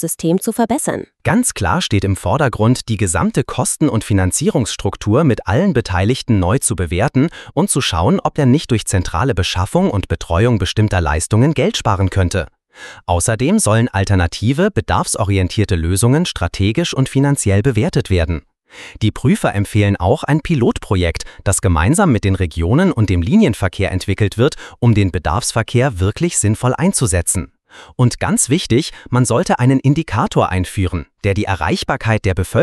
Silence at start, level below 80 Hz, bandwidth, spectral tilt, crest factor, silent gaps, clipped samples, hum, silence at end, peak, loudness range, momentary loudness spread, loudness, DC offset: 0 s; -32 dBFS; 13.5 kHz; -5.5 dB/octave; 14 dB; none; under 0.1%; none; 0 s; -2 dBFS; 1 LU; 5 LU; -16 LUFS; under 0.1%